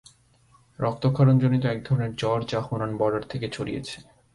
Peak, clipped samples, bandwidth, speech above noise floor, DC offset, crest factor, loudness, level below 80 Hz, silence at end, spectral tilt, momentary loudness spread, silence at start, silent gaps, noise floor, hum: -10 dBFS; under 0.1%; 11.5 kHz; 35 dB; under 0.1%; 16 dB; -25 LUFS; -54 dBFS; 0.35 s; -7.5 dB/octave; 13 LU; 0.8 s; none; -59 dBFS; none